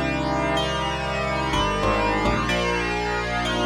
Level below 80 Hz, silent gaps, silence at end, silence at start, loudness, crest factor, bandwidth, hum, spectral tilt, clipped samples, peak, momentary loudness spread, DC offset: -34 dBFS; none; 0 s; 0 s; -23 LUFS; 14 dB; 15 kHz; none; -4.5 dB/octave; under 0.1%; -10 dBFS; 3 LU; under 0.1%